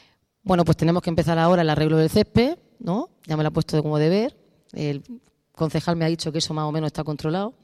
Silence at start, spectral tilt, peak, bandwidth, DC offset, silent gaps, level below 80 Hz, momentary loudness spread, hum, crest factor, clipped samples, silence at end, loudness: 0.45 s; -6.5 dB/octave; -6 dBFS; 13.5 kHz; under 0.1%; none; -48 dBFS; 10 LU; none; 16 dB; under 0.1%; 0.1 s; -22 LUFS